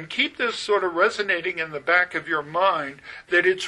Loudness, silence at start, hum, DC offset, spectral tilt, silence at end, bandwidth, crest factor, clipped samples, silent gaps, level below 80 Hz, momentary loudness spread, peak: -22 LUFS; 0 s; none; under 0.1%; -3 dB/octave; 0 s; 11.5 kHz; 18 dB; under 0.1%; none; -64 dBFS; 7 LU; -6 dBFS